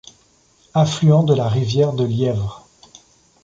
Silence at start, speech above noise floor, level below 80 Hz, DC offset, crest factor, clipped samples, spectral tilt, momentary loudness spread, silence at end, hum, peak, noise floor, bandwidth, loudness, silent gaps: 0.75 s; 40 dB; -48 dBFS; under 0.1%; 16 dB; under 0.1%; -7.5 dB/octave; 9 LU; 0.85 s; none; -2 dBFS; -56 dBFS; 7.6 kHz; -18 LUFS; none